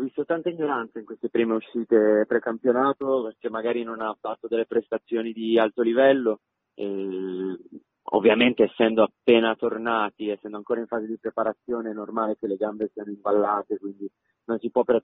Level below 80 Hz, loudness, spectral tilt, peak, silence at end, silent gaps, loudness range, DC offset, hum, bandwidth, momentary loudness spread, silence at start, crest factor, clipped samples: -68 dBFS; -25 LUFS; -9 dB/octave; -4 dBFS; 0.05 s; none; 6 LU; under 0.1%; none; 4 kHz; 12 LU; 0 s; 20 dB; under 0.1%